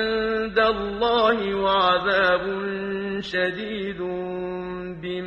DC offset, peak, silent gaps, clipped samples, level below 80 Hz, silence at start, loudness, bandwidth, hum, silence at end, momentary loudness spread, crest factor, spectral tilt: under 0.1%; -8 dBFS; none; under 0.1%; -50 dBFS; 0 s; -23 LUFS; 8.4 kHz; none; 0 s; 11 LU; 16 dB; -6 dB/octave